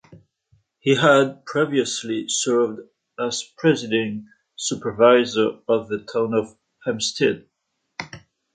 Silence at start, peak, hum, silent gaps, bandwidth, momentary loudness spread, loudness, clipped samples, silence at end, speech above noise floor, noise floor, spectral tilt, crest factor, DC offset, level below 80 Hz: 0.1 s; -2 dBFS; none; none; 9.6 kHz; 20 LU; -21 LUFS; under 0.1%; 0.35 s; 54 dB; -74 dBFS; -4 dB/octave; 20 dB; under 0.1%; -64 dBFS